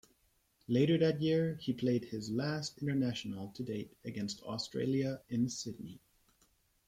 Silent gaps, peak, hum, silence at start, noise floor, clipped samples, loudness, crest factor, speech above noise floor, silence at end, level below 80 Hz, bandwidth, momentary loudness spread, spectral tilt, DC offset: none; -18 dBFS; none; 0.7 s; -74 dBFS; under 0.1%; -35 LUFS; 18 dB; 39 dB; 0.9 s; -70 dBFS; 15.5 kHz; 12 LU; -6 dB/octave; under 0.1%